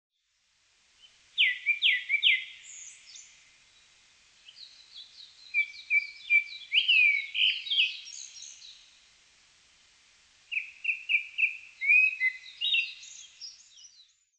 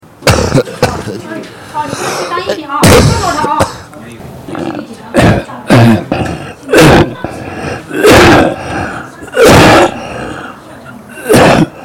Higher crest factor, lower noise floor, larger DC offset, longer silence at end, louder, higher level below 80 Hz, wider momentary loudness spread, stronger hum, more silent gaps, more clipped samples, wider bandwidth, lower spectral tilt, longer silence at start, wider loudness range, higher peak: first, 20 dB vs 10 dB; first, -73 dBFS vs -30 dBFS; neither; first, 0.85 s vs 0 s; second, -25 LUFS vs -8 LUFS; second, -82 dBFS vs -26 dBFS; first, 25 LU vs 20 LU; neither; neither; second, under 0.1% vs 0.2%; second, 10 kHz vs 17.5 kHz; second, 5.5 dB/octave vs -5 dB/octave; first, 1.35 s vs 0.2 s; first, 9 LU vs 4 LU; second, -12 dBFS vs 0 dBFS